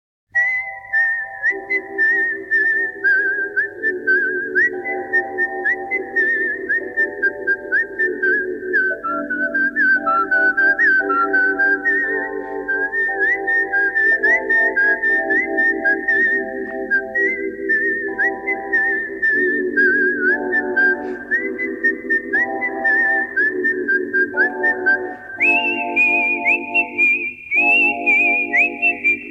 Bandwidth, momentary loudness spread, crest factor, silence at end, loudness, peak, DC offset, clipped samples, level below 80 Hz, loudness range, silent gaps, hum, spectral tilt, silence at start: 8.4 kHz; 7 LU; 12 dB; 0 s; -17 LUFS; -6 dBFS; under 0.1%; under 0.1%; -58 dBFS; 3 LU; none; 50 Hz at -55 dBFS; -4.5 dB/octave; 0.35 s